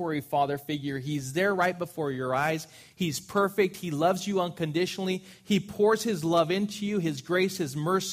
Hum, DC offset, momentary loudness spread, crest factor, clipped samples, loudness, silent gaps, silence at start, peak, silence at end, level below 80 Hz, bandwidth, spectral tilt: none; under 0.1%; 7 LU; 18 dB; under 0.1%; -28 LUFS; none; 0 s; -10 dBFS; 0 s; -66 dBFS; 15.5 kHz; -5 dB/octave